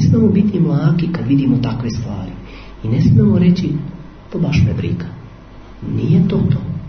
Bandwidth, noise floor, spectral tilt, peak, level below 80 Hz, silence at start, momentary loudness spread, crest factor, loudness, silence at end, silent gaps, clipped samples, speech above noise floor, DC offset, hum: 6.4 kHz; -36 dBFS; -9 dB/octave; -2 dBFS; -36 dBFS; 0 s; 18 LU; 14 dB; -15 LUFS; 0 s; none; under 0.1%; 22 dB; under 0.1%; none